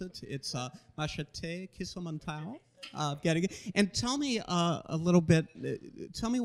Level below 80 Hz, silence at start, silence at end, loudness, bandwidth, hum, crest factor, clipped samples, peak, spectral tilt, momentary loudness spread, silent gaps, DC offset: -58 dBFS; 0 s; 0 s; -33 LUFS; 12 kHz; none; 20 dB; under 0.1%; -12 dBFS; -5.5 dB/octave; 14 LU; none; under 0.1%